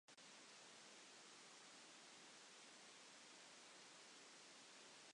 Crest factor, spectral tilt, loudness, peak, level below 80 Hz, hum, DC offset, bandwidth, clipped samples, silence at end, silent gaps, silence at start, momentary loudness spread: 14 dB; -0.5 dB/octave; -62 LUFS; -52 dBFS; under -90 dBFS; none; under 0.1%; 11 kHz; under 0.1%; 0 s; none; 0.1 s; 0 LU